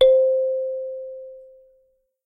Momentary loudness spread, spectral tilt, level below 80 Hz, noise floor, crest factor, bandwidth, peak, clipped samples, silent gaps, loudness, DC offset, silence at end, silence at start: 21 LU; -3.5 dB/octave; -58 dBFS; -64 dBFS; 16 dB; 4 kHz; -6 dBFS; under 0.1%; none; -22 LUFS; under 0.1%; 0.85 s; 0 s